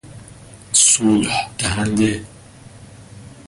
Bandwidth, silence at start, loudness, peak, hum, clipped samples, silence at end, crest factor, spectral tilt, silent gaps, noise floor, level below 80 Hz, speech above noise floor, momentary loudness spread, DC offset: 11.5 kHz; 0.05 s; -16 LUFS; -2 dBFS; none; under 0.1%; 0.15 s; 18 dB; -3 dB/octave; none; -41 dBFS; -44 dBFS; 23 dB; 10 LU; under 0.1%